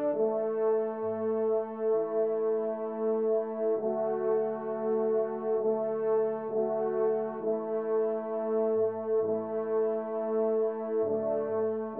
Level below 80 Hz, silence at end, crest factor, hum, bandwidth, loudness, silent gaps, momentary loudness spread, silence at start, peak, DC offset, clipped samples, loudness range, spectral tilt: -82 dBFS; 0 s; 10 dB; none; 2.8 kHz; -30 LUFS; none; 3 LU; 0 s; -18 dBFS; under 0.1%; under 0.1%; 0 LU; -8.5 dB/octave